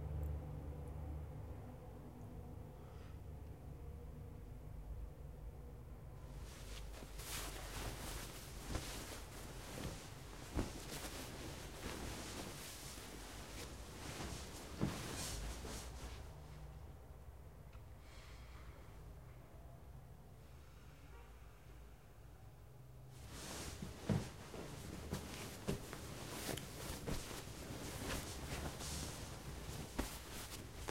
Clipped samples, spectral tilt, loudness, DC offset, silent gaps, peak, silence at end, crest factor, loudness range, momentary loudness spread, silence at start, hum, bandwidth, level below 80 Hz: under 0.1%; -4 dB/octave; -49 LUFS; under 0.1%; none; -24 dBFS; 0 s; 24 dB; 11 LU; 14 LU; 0 s; none; 16 kHz; -54 dBFS